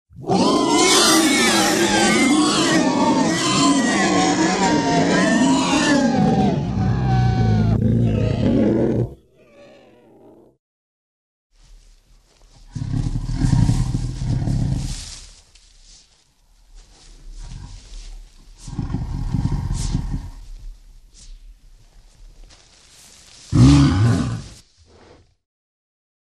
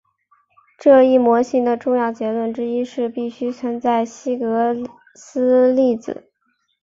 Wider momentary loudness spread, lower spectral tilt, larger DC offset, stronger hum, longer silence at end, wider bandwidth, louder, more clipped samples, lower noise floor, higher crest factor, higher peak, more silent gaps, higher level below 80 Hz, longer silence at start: first, 17 LU vs 12 LU; second, -4.5 dB/octave vs -6 dB/octave; neither; neither; first, 1.75 s vs 0.65 s; first, 14 kHz vs 7.6 kHz; about the same, -17 LUFS vs -18 LUFS; neither; second, -56 dBFS vs -68 dBFS; about the same, 18 dB vs 16 dB; about the same, -2 dBFS vs -2 dBFS; first, 10.59-11.50 s vs none; first, -32 dBFS vs -66 dBFS; second, 0.2 s vs 0.8 s